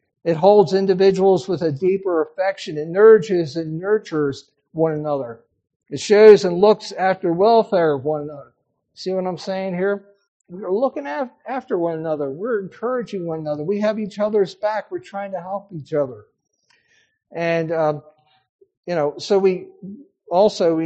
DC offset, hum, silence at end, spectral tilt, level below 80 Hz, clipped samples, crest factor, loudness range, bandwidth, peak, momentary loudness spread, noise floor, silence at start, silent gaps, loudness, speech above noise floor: under 0.1%; none; 0 s; -6.5 dB/octave; -66 dBFS; under 0.1%; 20 dB; 10 LU; 8.4 kHz; 0 dBFS; 15 LU; -61 dBFS; 0.25 s; 5.76-5.80 s, 10.28-10.40 s, 18.49-18.59 s, 18.77-18.83 s; -19 LUFS; 43 dB